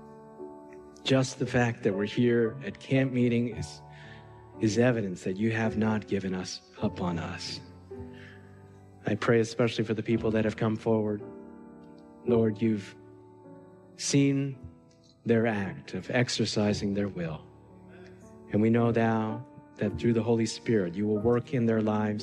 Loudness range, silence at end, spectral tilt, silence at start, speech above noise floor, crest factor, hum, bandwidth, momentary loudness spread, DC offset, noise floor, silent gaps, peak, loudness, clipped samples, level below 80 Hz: 4 LU; 0 s; -6 dB/octave; 0 s; 30 dB; 18 dB; none; 11 kHz; 20 LU; under 0.1%; -58 dBFS; none; -12 dBFS; -28 LUFS; under 0.1%; -62 dBFS